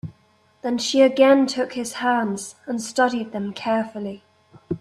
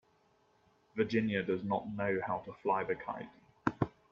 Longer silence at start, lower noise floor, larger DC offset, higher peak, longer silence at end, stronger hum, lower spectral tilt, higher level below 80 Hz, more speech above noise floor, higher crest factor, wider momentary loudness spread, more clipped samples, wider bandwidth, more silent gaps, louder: second, 0.05 s vs 0.95 s; second, -59 dBFS vs -71 dBFS; neither; first, -4 dBFS vs -12 dBFS; second, 0.05 s vs 0.2 s; neither; second, -4 dB/octave vs -8 dB/octave; about the same, -64 dBFS vs -66 dBFS; about the same, 39 dB vs 36 dB; second, 18 dB vs 24 dB; first, 17 LU vs 10 LU; neither; first, 12.5 kHz vs 7.2 kHz; neither; first, -21 LUFS vs -36 LUFS